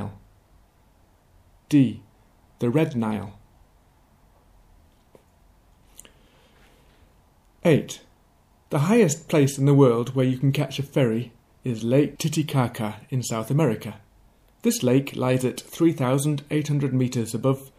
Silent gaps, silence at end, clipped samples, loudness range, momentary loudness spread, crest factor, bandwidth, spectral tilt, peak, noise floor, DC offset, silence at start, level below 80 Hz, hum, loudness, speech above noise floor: none; 0.1 s; under 0.1%; 9 LU; 12 LU; 18 dB; 15 kHz; -6.5 dB/octave; -6 dBFS; -59 dBFS; under 0.1%; 0 s; -60 dBFS; none; -23 LUFS; 37 dB